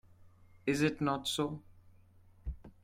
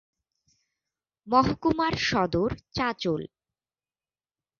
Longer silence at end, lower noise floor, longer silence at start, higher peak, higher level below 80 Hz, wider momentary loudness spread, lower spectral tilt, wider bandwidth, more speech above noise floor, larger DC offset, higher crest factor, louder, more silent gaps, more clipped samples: second, 0.15 s vs 1.35 s; second, -61 dBFS vs under -90 dBFS; second, 0.25 s vs 1.25 s; second, -16 dBFS vs -8 dBFS; about the same, -54 dBFS vs -50 dBFS; first, 16 LU vs 7 LU; about the same, -5 dB/octave vs -5.5 dB/octave; first, 16 kHz vs 7.2 kHz; second, 28 dB vs over 64 dB; neither; about the same, 22 dB vs 22 dB; second, -34 LUFS vs -26 LUFS; neither; neither